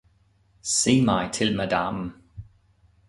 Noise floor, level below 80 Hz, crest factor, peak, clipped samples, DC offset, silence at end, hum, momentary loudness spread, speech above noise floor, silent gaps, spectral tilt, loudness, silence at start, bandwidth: -62 dBFS; -52 dBFS; 20 dB; -6 dBFS; under 0.1%; under 0.1%; 0.65 s; none; 15 LU; 39 dB; none; -4 dB/octave; -23 LUFS; 0.65 s; 11.5 kHz